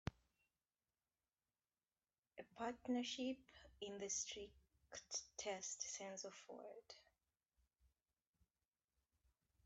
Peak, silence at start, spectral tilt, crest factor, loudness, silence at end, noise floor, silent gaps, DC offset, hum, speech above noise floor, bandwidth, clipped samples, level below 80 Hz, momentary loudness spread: -26 dBFS; 0.05 s; -2.5 dB/octave; 28 dB; -49 LUFS; 2.65 s; under -90 dBFS; 2.19-2.23 s; under 0.1%; none; over 40 dB; 8.2 kHz; under 0.1%; -76 dBFS; 17 LU